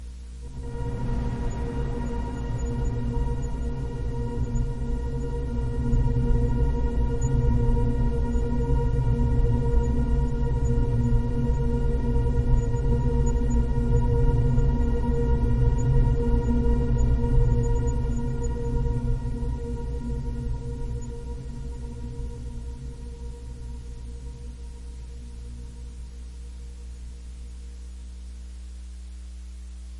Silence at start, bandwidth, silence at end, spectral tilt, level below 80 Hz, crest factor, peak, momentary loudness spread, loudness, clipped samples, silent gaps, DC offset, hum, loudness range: 0 s; 10.5 kHz; 0 s; -8.5 dB/octave; -26 dBFS; 16 dB; -8 dBFS; 17 LU; -27 LUFS; under 0.1%; none; under 0.1%; none; 16 LU